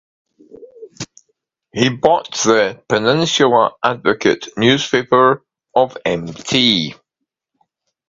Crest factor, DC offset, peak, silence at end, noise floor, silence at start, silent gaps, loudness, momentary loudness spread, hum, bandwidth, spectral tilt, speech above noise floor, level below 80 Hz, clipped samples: 18 dB; under 0.1%; 0 dBFS; 1.15 s; -78 dBFS; 0.55 s; none; -15 LUFS; 11 LU; none; 7.8 kHz; -4 dB/octave; 63 dB; -54 dBFS; under 0.1%